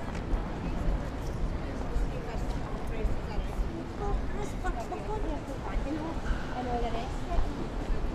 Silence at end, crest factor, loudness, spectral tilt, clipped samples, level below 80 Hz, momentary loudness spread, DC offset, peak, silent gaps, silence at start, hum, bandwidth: 0 s; 16 dB; -35 LUFS; -6.5 dB/octave; under 0.1%; -34 dBFS; 3 LU; under 0.1%; -14 dBFS; none; 0 s; none; 12 kHz